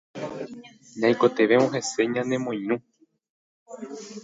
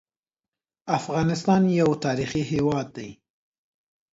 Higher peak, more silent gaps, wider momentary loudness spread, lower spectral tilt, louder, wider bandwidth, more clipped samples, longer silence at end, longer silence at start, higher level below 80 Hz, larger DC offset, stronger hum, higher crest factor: about the same, -6 dBFS vs -6 dBFS; first, 3.30-3.66 s vs none; first, 21 LU vs 17 LU; second, -5 dB/octave vs -6.5 dB/octave; about the same, -24 LUFS vs -24 LUFS; about the same, 8 kHz vs 8 kHz; neither; second, 0 s vs 1 s; second, 0.15 s vs 0.85 s; second, -72 dBFS vs -54 dBFS; neither; neither; about the same, 20 dB vs 18 dB